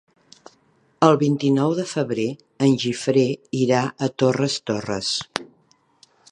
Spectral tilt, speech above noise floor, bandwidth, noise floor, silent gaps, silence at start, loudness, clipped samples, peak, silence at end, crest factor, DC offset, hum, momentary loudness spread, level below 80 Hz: -5.5 dB/octave; 40 dB; 11 kHz; -61 dBFS; none; 1 s; -21 LUFS; under 0.1%; 0 dBFS; 0.85 s; 22 dB; under 0.1%; none; 8 LU; -64 dBFS